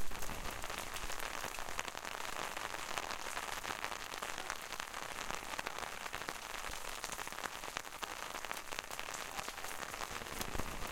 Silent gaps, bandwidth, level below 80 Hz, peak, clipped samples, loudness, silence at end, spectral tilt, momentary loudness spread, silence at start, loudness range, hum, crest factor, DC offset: none; 17 kHz; -54 dBFS; -14 dBFS; under 0.1%; -42 LUFS; 0 s; -1.5 dB/octave; 2 LU; 0 s; 1 LU; none; 28 dB; under 0.1%